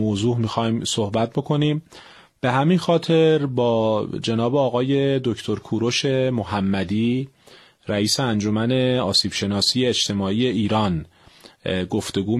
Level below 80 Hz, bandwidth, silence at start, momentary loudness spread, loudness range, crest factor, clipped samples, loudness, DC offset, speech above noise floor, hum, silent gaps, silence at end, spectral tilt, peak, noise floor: -54 dBFS; 13 kHz; 0 s; 7 LU; 2 LU; 16 dB; under 0.1%; -21 LUFS; under 0.1%; 30 dB; none; none; 0 s; -5 dB/octave; -4 dBFS; -50 dBFS